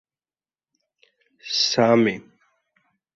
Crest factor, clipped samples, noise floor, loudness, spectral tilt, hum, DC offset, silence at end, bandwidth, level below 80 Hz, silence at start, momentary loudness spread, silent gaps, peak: 20 dB; under 0.1%; under -90 dBFS; -19 LUFS; -4 dB/octave; none; under 0.1%; 0.95 s; 7.6 kHz; -68 dBFS; 1.45 s; 19 LU; none; -4 dBFS